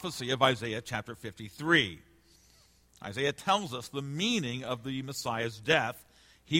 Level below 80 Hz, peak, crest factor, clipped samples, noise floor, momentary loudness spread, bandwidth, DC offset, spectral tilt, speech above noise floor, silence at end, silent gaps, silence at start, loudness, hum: -64 dBFS; -10 dBFS; 22 dB; under 0.1%; -63 dBFS; 16 LU; 16.5 kHz; under 0.1%; -4 dB/octave; 31 dB; 0 s; none; 0 s; -31 LUFS; none